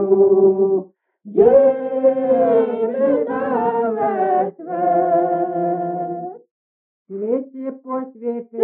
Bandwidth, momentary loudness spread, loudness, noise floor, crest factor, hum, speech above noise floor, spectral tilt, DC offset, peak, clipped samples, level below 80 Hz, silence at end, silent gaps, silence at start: 3.4 kHz; 14 LU; -18 LUFS; under -90 dBFS; 16 dB; none; over 74 dB; -8 dB/octave; under 0.1%; -2 dBFS; under 0.1%; -60 dBFS; 0 s; 6.51-7.05 s; 0 s